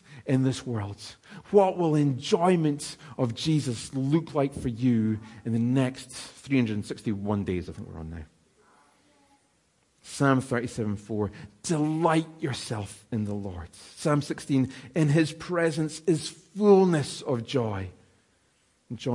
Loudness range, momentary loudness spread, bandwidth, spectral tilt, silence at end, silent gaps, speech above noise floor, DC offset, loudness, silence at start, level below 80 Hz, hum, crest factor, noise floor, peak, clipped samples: 7 LU; 16 LU; 11.5 kHz; -6.5 dB/octave; 0 s; none; 41 dB; under 0.1%; -27 LUFS; 0.1 s; -60 dBFS; none; 20 dB; -68 dBFS; -8 dBFS; under 0.1%